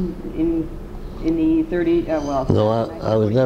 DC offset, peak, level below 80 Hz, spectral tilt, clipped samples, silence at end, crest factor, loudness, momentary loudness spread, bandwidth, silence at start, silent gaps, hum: under 0.1%; -2 dBFS; -34 dBFS; -8.5 dB/octave; under 0.1%; 0 s; 18 dB; -20 LUFS; 9 LU; 7.2 kHz; 0 s; none; none